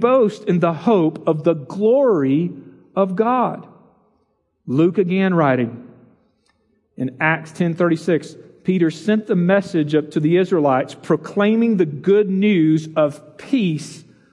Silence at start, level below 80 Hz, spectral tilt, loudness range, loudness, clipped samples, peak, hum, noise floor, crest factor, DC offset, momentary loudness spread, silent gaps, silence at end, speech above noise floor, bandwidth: 0 s; -70 dBFS; -7.5 dB/octave; 4 LU; -18 LUFS; under 0.1%; -2 dBFS; none; -66 dBFS; 16 dB; under 0.1%; 8 LU; none; 0.3 s; 49 dB; 11.5 kHz